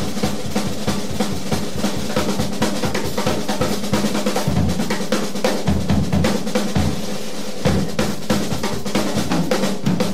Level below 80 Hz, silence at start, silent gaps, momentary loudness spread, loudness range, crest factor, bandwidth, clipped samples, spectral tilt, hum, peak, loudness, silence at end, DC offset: -36 dBFS; 0 s; none; 4 LU; 2 LU; 14 dB; 16 kHz; under 0.1%; -5 dB/octave; none; -6 dBFS; -21 LUFS; 0 s; 7%